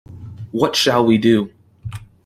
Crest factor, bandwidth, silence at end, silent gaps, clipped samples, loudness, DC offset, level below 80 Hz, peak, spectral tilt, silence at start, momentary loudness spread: 16 dB; 16 kHz; 0.2 s; none; under 0.1%; -16 LUFS; under 0.1%; -52 dBFS; -2 dBFS; -5 dB/octave; 0.1 s; 21 LU